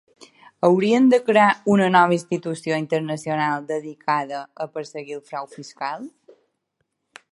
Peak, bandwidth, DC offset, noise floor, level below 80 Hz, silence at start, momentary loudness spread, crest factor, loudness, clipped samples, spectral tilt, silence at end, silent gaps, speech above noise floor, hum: -2 dBFS; 11.5 kHz; under 0.1%; -75 dBFS; -68 dBFS; 0.6 s; 17 LU; 20 dB; -20 LUFS; under 0.1%; -6 dB/octave; 1.25 s; none; 55 dB; none